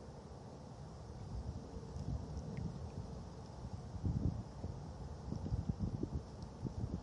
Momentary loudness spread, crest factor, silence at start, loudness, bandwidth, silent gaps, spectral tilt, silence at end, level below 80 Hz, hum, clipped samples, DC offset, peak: 11 LU; 20 dB; 0 s; -46 LUFS; 11 kHz; none; -8 dB/octave; 0 s; -50 dBFS; none; under 0.1%; under 0.1%; -24 dBFS